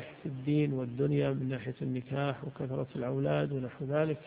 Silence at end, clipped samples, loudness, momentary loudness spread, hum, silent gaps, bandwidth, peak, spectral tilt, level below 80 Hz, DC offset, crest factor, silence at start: 0 s; under 0.1%; -33 LUFS; 7 LU; none; none; 4.8 kHz; -16 dBFS; -11.5 dB/octave; -64 dBFS; under 0.1%; 16 dB; 0 s